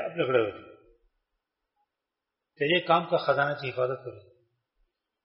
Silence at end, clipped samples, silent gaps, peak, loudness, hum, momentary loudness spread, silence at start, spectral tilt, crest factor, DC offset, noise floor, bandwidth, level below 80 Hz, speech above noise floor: 1.05 s; under 0.1%; none; -8 dBFS; -27 LUFS; none; 13 LU; 0 s; -3 dB/octave; 22 dB; under 0.1%; -87 dBFS; 5.8 kHz; -72 dBFS; 60 dB